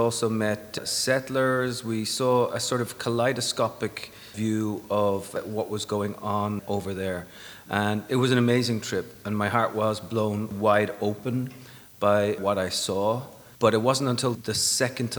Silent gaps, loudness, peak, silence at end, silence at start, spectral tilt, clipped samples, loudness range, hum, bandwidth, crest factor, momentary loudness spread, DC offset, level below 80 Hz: none; -26 LUFS; -4 dBFS; 0 s; 0 s; -4.5 dB/octave; under 0.1%; 4 LU; none; 19 kHz; 20 dB; 9 LU; under 0.1%; -62 dBFS